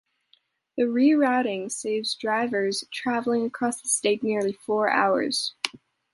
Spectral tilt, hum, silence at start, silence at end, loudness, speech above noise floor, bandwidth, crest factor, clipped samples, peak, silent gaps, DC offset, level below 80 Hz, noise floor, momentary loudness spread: -3 dB/octave; none; 0.75 s; 0.45 s; -25 LUFS; 41 dB; 11.5 kHz; 20 dB; under 0.1%; -4 dBFS; none; under 0.1%; -72 dBFS; -65 dBFS; 8 LU